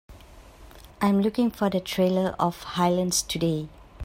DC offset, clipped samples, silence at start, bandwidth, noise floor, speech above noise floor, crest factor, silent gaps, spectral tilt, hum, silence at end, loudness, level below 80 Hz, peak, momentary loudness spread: under 0.1%; under 0.1%; 0.1 s; 16 kHz; -48 dBFS; 24 dB; 18 dB; none; -5 dB/octave; none; 0 s; -25 LUFS; -52 dBFS; -8 dBFS; 5 LU